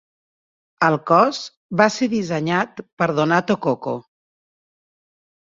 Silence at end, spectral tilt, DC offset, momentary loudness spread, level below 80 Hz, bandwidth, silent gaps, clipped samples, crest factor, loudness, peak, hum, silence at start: 1.5 s; -5.5 dB/octave; under 0.1%; 11 LU; -62 dBFS; 7.8 kHz; 1.57-1.69 s, 2.93-2.97 s; under 0.1%; 20 dB; -19 LUFS; -2 dBFS; none; 0.8 s